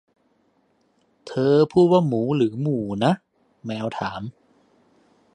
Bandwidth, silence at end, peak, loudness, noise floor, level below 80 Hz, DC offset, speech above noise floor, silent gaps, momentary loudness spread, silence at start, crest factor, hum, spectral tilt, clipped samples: 9.8 kHz; 1.05 s; -4 dBFS; -21 LUFS; -65 dBFS; -60 dBFS; under 0.1%; 45 dB; none; 16 LU; 1.25 s; 20 dB; none; -8 dB/octave; under 0.1%